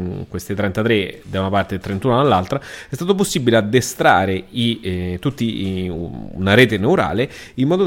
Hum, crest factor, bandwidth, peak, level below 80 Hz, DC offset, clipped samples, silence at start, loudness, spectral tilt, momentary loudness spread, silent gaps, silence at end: none; 18 dB; 17 kHz; 0 dBFS; -44 dBFS; under 0.1%; under 0.1%; 0 s; -18 LUFS; -5.5 dB/octave; 12 LU; none; 0 s